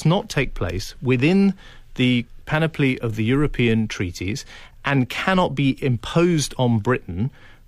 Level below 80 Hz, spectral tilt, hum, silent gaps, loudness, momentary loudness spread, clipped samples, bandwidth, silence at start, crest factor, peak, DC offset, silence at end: -38 dBFS; -6 dB/octave; none; none; -21 LUFS; 9 LU; under 0.1%; 15 kHz; 0 s; 14 dB; -6 dBFS; under 0.1%; 0.15 s